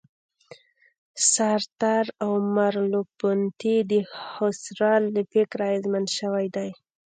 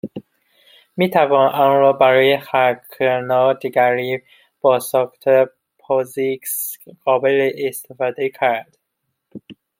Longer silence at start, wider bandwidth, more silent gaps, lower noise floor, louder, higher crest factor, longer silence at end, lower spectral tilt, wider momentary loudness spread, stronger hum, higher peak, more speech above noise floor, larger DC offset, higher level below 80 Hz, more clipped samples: first, 1.15 s vs 0.05 s; second, 9.6 kHz vs 16.5 kHz; first, 1.72-1.76 s vs none; second, -51 dBFS vs -75 dBFS; second, -24 LUFS vs -17 LUFS; about the same, 18 dB vs 16 dB; first, 0.45 s vs 0.25 s; about the same, -4 dB/octave vs -4.5 dB/octave; second, 6 LU vs 11 LU; neither; second, -8 dBFS vs -2 dBFS; second, 27 dB vs 58 dB; neither; second, -76 dBFS vs -68 dBFS; neither